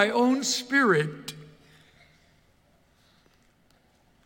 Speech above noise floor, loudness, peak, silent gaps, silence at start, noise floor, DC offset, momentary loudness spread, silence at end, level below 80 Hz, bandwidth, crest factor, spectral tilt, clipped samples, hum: 40 dB; -24 LUFS; -8 dBFS; none; 0 s; -63 dBFS; under 0.1%; 19 LU; 2.8 s; -70 dBFS; 17 kHz; 22 dB; -3.5 dB/octave; under 0.1%; none